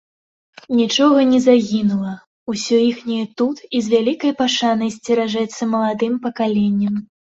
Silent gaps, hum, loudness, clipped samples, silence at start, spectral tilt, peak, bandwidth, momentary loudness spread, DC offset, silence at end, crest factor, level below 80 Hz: 2.27-2.46 s; none; -18 LUFS; under 0.1%; 0.7 s; -5 dB/octave; -2 dBFS; 8 kHz; 10 LU; under 0.1%; 0.35 s; 16 dB; -60 dBFS